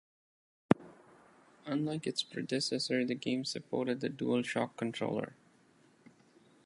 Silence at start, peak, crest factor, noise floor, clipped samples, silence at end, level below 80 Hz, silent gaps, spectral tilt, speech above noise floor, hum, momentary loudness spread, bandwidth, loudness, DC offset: 0.7 s; -6 dBFS; 30 dB; -66 dBFS; under 0.1%; 1.3 s; -74 dBFS; none; -5 dB/octave; 31 dB; none; 5 LU; 11.5 kHz; -35 LUFS; under 0.1%